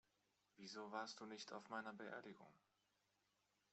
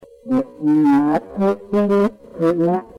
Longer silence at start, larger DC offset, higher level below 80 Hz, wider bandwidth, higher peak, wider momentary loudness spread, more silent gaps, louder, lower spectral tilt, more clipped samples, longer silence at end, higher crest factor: first, 0.55 s vs 0.25 s; neither; second, under -90 dBFS vs -52 dBFS; second, 8.2 kHz vs 10.5 kHz; second, -34 dBFS vs -8 dBFS; first, 11 LU vs 7 LU; neither; second, -54 LUFS vs -18 LUFS; second, -3 dB/octave vs -9 dB/octave; neither; first, 1.15 s vs 0.15 s; first, 24 dB vs 10 dB